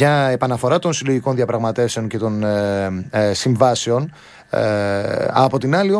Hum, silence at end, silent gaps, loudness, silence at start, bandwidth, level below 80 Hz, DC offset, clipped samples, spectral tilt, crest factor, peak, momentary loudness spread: none; 0 s; none; -18 LUFS; 0 s; 11 kHz; -54 dBFS; under 0.1%; under 0.1%; -5.5 dB/octave; 18 dB; 0 dBFS; 6 LU